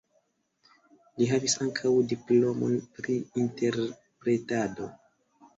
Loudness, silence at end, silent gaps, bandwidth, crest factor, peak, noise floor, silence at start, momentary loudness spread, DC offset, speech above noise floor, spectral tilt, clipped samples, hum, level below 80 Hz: -28 LUFS; 0.65 s; none; 8 kHz; 16 dB; -12 dBFS; -72 dBFS; 1.15 s; 10 LU; under 0.1%; 45 dB; -5 dB/octave; under 0.1%; none; -68 dBFS